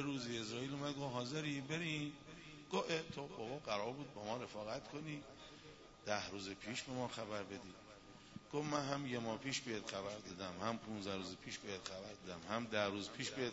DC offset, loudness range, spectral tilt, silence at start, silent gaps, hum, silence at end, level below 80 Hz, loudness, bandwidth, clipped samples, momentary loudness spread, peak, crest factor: under 0.1%; 3 LU; -3.5 dB/octave; 0 s; none; none; 0 s; -72 dBFS; -44 LUFS; 7.6 kHz; under 0.1%; 15 LU; -22 dBFS; 24 dB